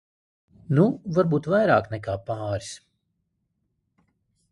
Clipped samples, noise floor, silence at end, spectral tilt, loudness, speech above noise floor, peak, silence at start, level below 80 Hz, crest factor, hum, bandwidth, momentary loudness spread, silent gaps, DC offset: under 0.1%; -76 dBFS; 1.75 s; -7.5 dB/octave; -24 LUFS; 53 dB; -6 dBFS; 0.7 s; -56 dBFS; 20 dB; none; 11.5 kHz; 12 LU; none; under 0.1%